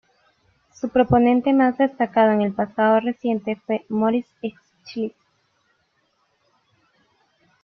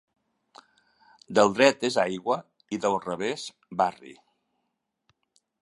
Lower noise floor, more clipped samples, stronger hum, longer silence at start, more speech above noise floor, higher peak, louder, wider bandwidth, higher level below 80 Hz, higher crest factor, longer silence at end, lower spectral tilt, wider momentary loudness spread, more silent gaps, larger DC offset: second, -68 dBFS vs -80 dBFS; neither; neither; second, 0.85 s vs 1.3 s; second, 48 dB vs 54 dB; about the same, -4 dBFS vs -4 dBFS; first, -20 LUFS vs -26 LUFS; second, 6.4 kHz vs 11.5 kHz; first, -54 dBFS vs -70 dBFS; second, 18 dB vs 24 dB; first, 2.55 s vs 1.5 s; first, -8 dB/octave vs -4 dB/octave; first, 15 LU vs 12 LU; neither; neither